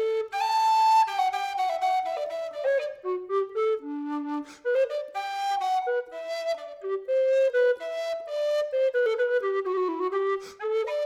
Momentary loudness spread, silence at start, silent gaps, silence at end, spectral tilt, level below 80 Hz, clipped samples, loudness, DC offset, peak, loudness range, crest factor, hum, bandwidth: 10 LU; 0 s; none; 0 s; -2 dB/octave; -78 dBFS; under 0.1%; -27 LUFS; under 0.1%; -14 dBFS; 4 LU; 14 dB; none; 14.5 kHz